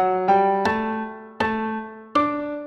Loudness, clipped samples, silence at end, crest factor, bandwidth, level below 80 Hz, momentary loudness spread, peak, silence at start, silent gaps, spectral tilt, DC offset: -22 LUFS; under 0.1%; 0 s; 16 dB; 10.5 kHz; -56 dBFS; 11 LU; -6 dBFS; 0 s; none; -6.5 dB/octave; under 0.1%